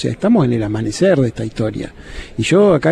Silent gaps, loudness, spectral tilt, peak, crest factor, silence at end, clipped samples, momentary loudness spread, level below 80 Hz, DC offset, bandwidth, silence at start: none; -15 LUFS; -6.5 dB/octave; -2 dBFS; 14 dB; 0 s; under 0.1%; 16 LU; -38 dBFS; under 0.1%; 11.5 kHz; 0 s